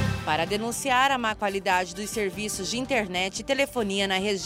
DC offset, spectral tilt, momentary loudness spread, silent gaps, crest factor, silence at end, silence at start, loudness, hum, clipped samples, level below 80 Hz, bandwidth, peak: under 0.1%; -3.5 dB/octave; 6 LU; none; 18 dB; 0 s; 0 s; -26 LUFS; none; under 0.1%; -50 dBFS; 16 kHz; -10 dBFS